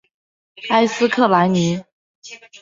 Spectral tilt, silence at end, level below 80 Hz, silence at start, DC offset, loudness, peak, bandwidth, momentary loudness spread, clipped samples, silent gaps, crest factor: -5.5 dB/octave; 0.05 s; -60 dBFS; 0.6 s; under 0.1%; -17 LUFS; -2 dBFS; 7.8 kHz; 23 LU; under 0.1%; 1.92-2.22 s; 18 dB